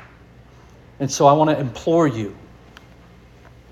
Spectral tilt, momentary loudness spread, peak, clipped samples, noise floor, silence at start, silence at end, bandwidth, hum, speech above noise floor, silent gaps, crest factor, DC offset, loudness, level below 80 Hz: -6 dB/octave; 15 LU; -2 dBFS; under 0.1%; -46 dBFS; 1 s; 1.35 s; 15.5 kHz; none; 29 dB; none; 20 dB; under 0.1%; -18 LUFS; -50 dBFS